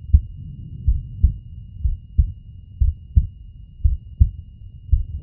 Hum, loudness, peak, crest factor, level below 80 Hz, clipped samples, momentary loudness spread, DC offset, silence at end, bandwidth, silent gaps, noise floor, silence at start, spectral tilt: none; -24 LUFS; 0 dBFS; 20 dB; -22 dBFS; under 0.1%; 19 LU; under 0.1%; 0 s; 0.5 kHz; none; -40 dBFS; 0.05 s; -12.5 dB/octave